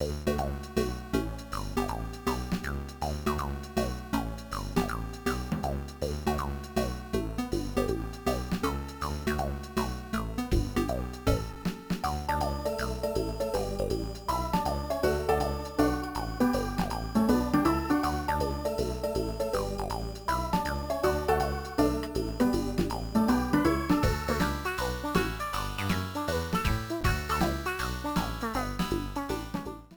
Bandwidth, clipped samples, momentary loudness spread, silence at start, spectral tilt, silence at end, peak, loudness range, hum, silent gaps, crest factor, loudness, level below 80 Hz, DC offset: over 20 kHz; under 0.1%; 7 LU; 0 s; -6 dB/octave; 0 s; -10 dBFS; 5 LU; none; none; 20 dB; -31 LUFS; -38 dBFS; under 0.1%